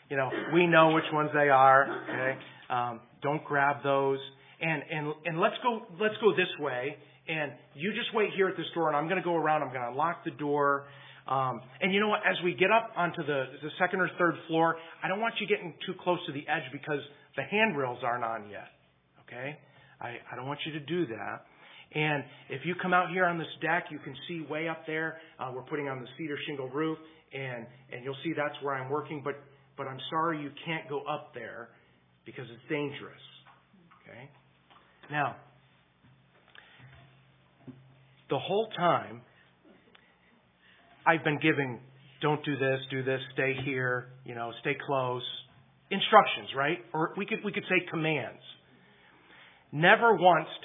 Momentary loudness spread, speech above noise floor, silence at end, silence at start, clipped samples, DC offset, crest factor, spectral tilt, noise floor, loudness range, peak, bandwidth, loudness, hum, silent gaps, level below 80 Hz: 17 LU; 35 dB; 0.05 s; 0.1 s; under 0.1%; under 0.1%; 26 dB; -9 dB/octave; -65 dBFS; 10 LU; -6 dBFS; 3.9 kHz; -30 LUFS; none; none; -80 dBFS